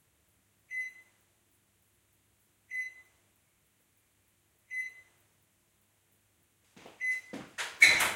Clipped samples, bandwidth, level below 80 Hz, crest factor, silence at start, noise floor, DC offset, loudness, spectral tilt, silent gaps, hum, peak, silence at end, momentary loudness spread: under 0.1%; 16.5 kHz; -72 dBFS; 30 dB; 0.7 s; -72 dBFS; under 0.1%; -30 LUFS; 0.5 dB/octave; none; none; -6 dBFS; 0 s; 20 LU